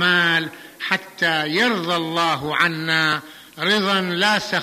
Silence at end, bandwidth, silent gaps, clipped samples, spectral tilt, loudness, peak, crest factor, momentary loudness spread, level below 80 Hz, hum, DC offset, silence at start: 0 s; 15 kHz; none; under 0.1%; -3.5 dB/octave; -19 LUFS; -4 dBFS; 16 dB; 7 LU; -62 dBFS; none; under 0.1%; 0 s